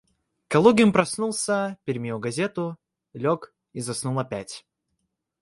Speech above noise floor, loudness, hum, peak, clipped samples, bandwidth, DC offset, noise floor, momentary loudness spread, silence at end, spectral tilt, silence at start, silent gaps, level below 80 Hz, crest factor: 55 dB; -24 LUFS; none; -2 dBFS; under 0.1%; 11.5 kHz; under 0.1%; -78 dBFS; 16 LU; 0.8 s; -5 dB/octave; 0.5 s; none; -62 dBFS; 22 dB